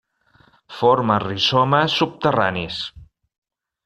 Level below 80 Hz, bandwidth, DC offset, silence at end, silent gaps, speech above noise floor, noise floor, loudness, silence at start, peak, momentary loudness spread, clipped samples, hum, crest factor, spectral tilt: -54 dBFS; 11.5 kHz; under 0.1%; 0.8 s; none; 38 dB; -57 dBFS; -19 LUFS; 0.7 s; -2 dBFS; 12 LU; under 0.1%; none; 18 dB; -5.5 dB/octave